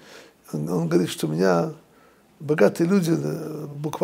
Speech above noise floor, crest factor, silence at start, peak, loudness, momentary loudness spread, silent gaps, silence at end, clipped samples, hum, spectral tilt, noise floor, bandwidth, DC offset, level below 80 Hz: 33 dB; 20 dB; 0.05 s; -4 dBFS; -23 LUFS; 12 LU; none; 0 s; under 0.1%; none; -6.5 dB/octave; -55 dBFS; 16 kHz; under 0.1%; -66 dBFS